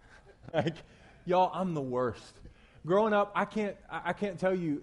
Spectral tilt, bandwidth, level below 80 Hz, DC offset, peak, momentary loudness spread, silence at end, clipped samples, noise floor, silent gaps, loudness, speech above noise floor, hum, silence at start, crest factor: -7 dB/octave; 11.5 kHz; -60 dBFS; under 0.1%; -16 dBFS; 12 LU; 0 s; under 0.1%; -53 dBFS; none; -31 LUFS; 23 dB; none; 0.15 s; 16 dB